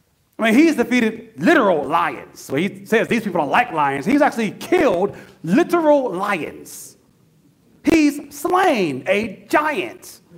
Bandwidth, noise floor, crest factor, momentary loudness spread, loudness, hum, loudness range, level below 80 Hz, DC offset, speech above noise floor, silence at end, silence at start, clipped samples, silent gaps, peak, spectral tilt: 16 kHz; -55 dBFS; 18 dB; 10 LU; -18 LUFS; none; 3 LU; -54 dBFS; under 0.1%; 37 dB; 0.25 s; 0.4 s; under 0.1%; none; -2 dBFS; -5.5 dB/octave